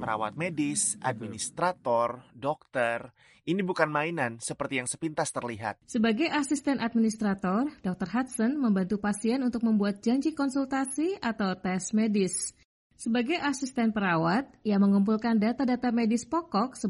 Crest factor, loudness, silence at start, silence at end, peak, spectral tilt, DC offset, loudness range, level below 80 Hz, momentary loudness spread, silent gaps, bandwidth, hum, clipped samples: 18 dB; -29 LUFS; 0 s; 0 s; -10 dBFS; -5 dB/octave; under 0.1%; 4 LU; -64 dBFS; 7 LU; 12.65-12.90 s; 11.5 kHz; none; under 0.1%